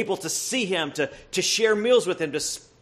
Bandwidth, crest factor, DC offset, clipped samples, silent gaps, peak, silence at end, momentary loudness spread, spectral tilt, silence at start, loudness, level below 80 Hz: 14.5 kHz; 16 dB; under 0.1%; under 0.1%; none; -8 dBFS; 0.25 s; 8 LU; -2.5 dB/octave; 0 s; -24 LUFS; -62 dBFS